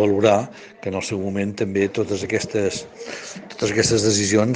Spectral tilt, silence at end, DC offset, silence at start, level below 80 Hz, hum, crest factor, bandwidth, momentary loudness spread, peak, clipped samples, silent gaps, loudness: -4.5 dB/octave; 0 s; under 0.1%; 0 s; -54 dBFS; none; 20 dB; 10 kHz; 15 LU; -2 dBFS; under 0.1%; none; -21 LUFS